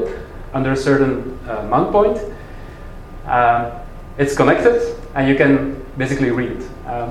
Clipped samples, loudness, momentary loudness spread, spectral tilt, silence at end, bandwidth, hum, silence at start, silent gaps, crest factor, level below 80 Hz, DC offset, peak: under 0.1%; -17 LUFS; 20 LU; -6.5 dB/octave; 0 s; 12.5 kHz; none; 0 s; none; 18 dB; -34 dBFS; under 0.1%; 0 dBFS